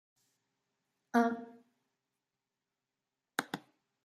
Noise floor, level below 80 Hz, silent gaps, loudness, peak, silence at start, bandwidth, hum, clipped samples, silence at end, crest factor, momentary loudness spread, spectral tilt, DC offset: -90 dBFS; under -90 dBFS; none; -35 LUFS; -14 dBFS; 1.15 s; 15 kHz; none; under 0.1%; 0.45 s; 28 dB; 15 LU; -4.5 dB/octave; under 0.1%